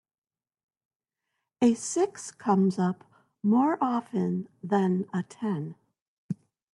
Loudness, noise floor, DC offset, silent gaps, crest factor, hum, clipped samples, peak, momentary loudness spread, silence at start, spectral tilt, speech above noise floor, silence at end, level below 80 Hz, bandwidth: -27 LUFS; under -90 dBFS; under 0.1%; 6.02-6.29 s; 18 dB; none; under 0.1%; -12 dBFS; 15 LU; 1.6 s; -6.5 dB/octave; over 64 dB; 0.4 s; -76 dBFS; 11.5 kHz